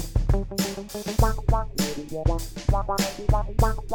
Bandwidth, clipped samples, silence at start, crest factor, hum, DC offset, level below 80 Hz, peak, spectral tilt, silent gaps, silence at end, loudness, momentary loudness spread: over 20 kHz; under 0.1%; 0 s; 18 dB; none; under 0.1%; -28 dBFS; -6 dBFS; -5.5 dB/octave; none; 0 s; -26 LUFS; 5 LU